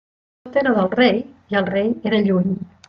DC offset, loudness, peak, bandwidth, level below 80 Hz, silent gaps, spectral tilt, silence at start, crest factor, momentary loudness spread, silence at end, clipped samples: under 0.1%; -19 LUFS; -4 dBFS; 5.6 kHz; -60 dBFS; none; -8.5 dB/octave; 0.45 s; 16 dB; 7 LU; 0.2 s; under 0.1%